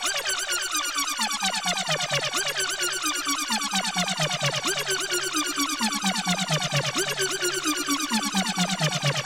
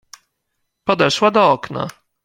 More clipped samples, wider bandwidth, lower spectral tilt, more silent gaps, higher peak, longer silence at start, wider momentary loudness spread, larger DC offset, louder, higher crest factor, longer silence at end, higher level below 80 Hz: neither; about the same, 16 kHz vs 16.5 kHz; second, -2 dB/octave vs -4.5 dB/octave; neither; second, -14 dBFS vs 0 dBFS; second, 0 s vs 0.85 s; second, 1 LU vs 13 LU; neither; second, -24 LUFS vs -16 LUFS; second, 12 dB vs 18 dB; second, 0 s vs 0.35 s; about the same, -60 dBFS vs -58 dBFS